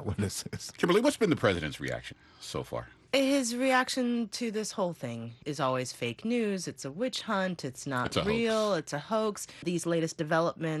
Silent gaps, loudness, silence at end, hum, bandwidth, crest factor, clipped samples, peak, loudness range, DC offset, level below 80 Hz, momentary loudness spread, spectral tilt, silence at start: none; -31 LUFS; 0 s; none; 12.5 kHz; 20 dB; under 0.1%; -10 dBFS; 3 LU; under 0.1%; -60 dBFS; 12 LU; -4.5 dB/octave; 0 s